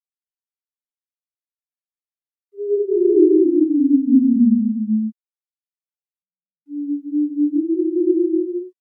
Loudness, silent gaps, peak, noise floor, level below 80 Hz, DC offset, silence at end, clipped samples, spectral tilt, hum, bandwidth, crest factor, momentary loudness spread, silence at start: -17 LUFS; 5.20-5.24 s, 5.57-5.61 s; -2 dBFS; under -90 dBFS; under -90 dBFS; under 0.1%; 0.1 s; under 0.1%; -16 dB/octave; none; 0.5 kHz; 18 dB; 13 LU; 2.55 s